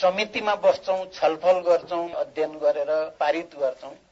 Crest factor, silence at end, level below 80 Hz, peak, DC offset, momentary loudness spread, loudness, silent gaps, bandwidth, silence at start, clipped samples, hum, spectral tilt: 16 dB; 0.15 s; -66 dBFS; -8 dBFS; under 0.1%; 7 LU; -24 LUFS; none; 7.8 kHz; 0 s; under 0.1%; none; -4 dB/octave